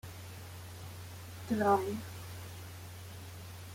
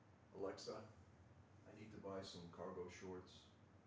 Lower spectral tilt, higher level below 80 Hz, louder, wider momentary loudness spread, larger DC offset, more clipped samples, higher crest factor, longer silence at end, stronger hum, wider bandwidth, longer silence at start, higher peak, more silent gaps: about the same, -5.5 dB/octave vs -5 dB/octave; first, -66 dBFS vs -76 dBFS; first, -38 LUFS vs -55 LUFS; about the same, 18 LU vs 16 LU; neither; neither; about the same, 22 dB vs 18 dB; about the same, 0 s vs 0 s; neither; first, 16.5 kHz vs 8 kHz; about the same, 0.05 s vs 0 s; first, -16 dBFS vs -36 dBFS; neither